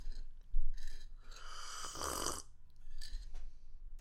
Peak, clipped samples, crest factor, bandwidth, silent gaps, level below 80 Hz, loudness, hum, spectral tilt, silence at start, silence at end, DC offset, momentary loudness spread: -20 dBFS; under 0.1%; 18 dB; 14 kHz; none; -40 dBFS; -45 LUFS; none; -2.5 dB/octave; 0 s; 0 s; under 0.1%; 20 LU